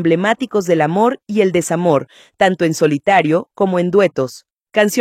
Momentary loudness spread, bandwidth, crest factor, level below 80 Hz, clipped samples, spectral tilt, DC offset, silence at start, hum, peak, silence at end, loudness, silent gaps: 4 LU; 16 kHz; 16 dB; -58 dBFS; under 0.1%; -5.5 dB/octave; under 0.1%; 0 s; none; 0 dBFS; 0 s; -16 LUFS; 4.52-4.56 s